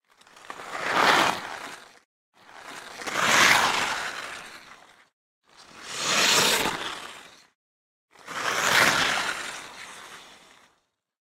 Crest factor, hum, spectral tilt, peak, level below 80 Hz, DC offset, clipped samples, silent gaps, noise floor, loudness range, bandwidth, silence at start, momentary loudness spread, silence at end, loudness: 24 dB; none; -0.5 dB/octave; -4 dBFS; -62 dBFS; under 0.1%; under 0.1%; 2.05-2.32 s, 5.13-5.42 s, 7.55-8.08 s; -71 dBFS; 3 LU; 16 kHz; 0.45 s; 24 LU; 1 s; -22 LUFS